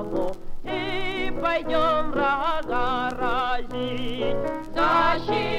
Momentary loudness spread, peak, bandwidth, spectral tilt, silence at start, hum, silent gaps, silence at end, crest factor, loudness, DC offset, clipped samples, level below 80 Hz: 8 LU; -10 dBFS; 8.2 kHz; -5.5 dB/octave; 0 s; none; none; 0 s; 14 dB; -25 LUFS; under 0.1%; under 0.1%; -36 dBFS